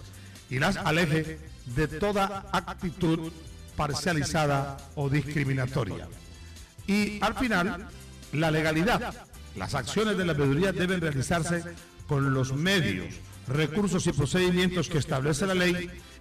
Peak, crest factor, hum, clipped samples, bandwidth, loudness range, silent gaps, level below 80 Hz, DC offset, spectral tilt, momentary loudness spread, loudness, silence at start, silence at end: -16 dBFS; 12 dB; none; under 0.1%; 15.5 kHz; 3 LU; none; -46 dBFS; under 0.1%; -5.5 dB/octave; 17 LU; -28 LUFS; 0 s; 0 s